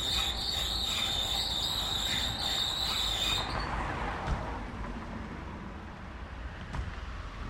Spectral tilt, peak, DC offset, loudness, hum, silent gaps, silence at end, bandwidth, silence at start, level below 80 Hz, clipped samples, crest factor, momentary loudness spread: -2.5 dB/octave; -18 dBFS; under 0.1%; -31 LUFS; none; none; 0 s; 16.5 kHz; 0 s; -42 dBFS; under 0.1%; 16 dB; 14 LU